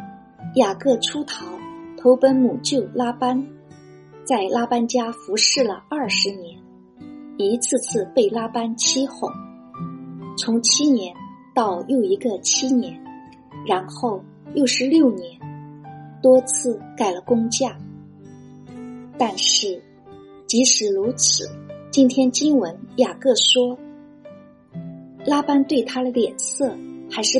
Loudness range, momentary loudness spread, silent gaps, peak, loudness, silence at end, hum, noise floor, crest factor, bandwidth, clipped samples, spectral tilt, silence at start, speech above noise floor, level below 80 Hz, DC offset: 4 LU; 21 LU; none; -2 dBFS; -19 LUFS; 0 s; none; -45 dBFS; 18 dB; 11.5 kHz; under 0.1%; -2.5 dB/octave; 0 s; 25 dB; -66 dBFS; under 0.1%